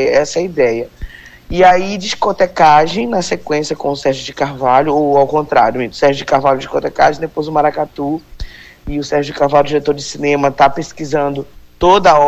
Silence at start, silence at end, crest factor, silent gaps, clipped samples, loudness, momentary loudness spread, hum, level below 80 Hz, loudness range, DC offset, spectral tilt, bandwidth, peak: 0 s; 0 s; 14 dB; none; under 0.1%; -14 LUFS; 13 LU; none; -38 dBFS; 3 LU; under 0.1%; -5 dB/octave; 15 kHz; 0 dBFS